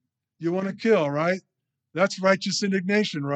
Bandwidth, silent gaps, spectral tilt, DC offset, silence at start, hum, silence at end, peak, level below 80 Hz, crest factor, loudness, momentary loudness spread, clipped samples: 9 kHz; none; -5 dB/octave; under 0.1%; 0.4 s; none; 0 s; -6 dBFS; -80 dBFS; 18 dB; -24 LUFS; 8 LU; under 0.1%